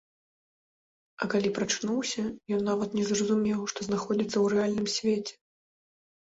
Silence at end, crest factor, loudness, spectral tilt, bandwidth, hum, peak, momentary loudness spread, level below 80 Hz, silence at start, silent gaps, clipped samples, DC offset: 0.9 s; 16 dB; -29 LUFS; -4.5 dB/octave; 8 kHz; none; -14 dBFS; 6 LU; -66 dBFS; 1.2 s; none; under 0.1%; under 0.1%